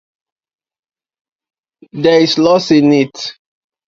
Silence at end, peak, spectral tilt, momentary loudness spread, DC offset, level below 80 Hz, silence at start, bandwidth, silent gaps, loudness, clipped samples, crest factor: 0.55 s; 0 dBFS; -5.5 dB/octave; 15 LU; under 0.1%; -56 dBFS; 1.95 s; 7.6 kHz; none; -11 LUFS; under 0.1%; 14 dB